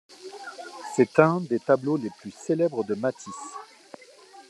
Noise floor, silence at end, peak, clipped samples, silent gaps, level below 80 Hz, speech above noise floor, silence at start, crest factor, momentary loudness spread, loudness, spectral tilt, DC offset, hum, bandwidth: -50 dBFS; 0.1 s; -2 dBFS; under 0.1%; none; -76 dBFS; 26 dB; 0.2 s; 24 dB; 20 LU; -25 LUFS; -6.5 dB/octave; under 0.1%; none; 12 kHz